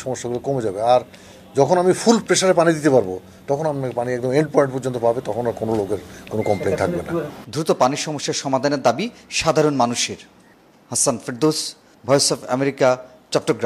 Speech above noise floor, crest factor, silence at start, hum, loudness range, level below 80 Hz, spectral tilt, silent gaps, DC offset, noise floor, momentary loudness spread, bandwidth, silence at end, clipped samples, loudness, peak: 32 dB; 20 dB; 0 s; none; 4 LU; -54 dBFS; -4 dB/octave; none; under 0.1%; -51 dBFS; 10 LU; 15 kHz; 0 s; under 0.1%; -20 LUFS; 0 dBFS